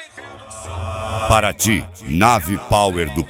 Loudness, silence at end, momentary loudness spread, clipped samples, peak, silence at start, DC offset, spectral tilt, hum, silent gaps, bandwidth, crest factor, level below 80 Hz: -17 LUFS; 0 s; 19 LU; under 0.1%; 0 dBFS; 0 s; under 0.1%; -4.5 dB/octave; none; none; 17 kHz; 18 dB; -34 dBFS